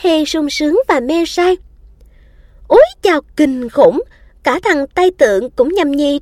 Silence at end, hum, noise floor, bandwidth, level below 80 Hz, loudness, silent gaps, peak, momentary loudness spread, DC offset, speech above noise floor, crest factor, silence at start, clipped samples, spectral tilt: 0 s; none; -43 dBFS; 14.5 kHz; -42 dBFS; -13 LUFS; none; 0 dBFS; 6 LU; under 0.1%; 31 dB; 14 dB; 0 s; under 0.1%; -4 dB/octave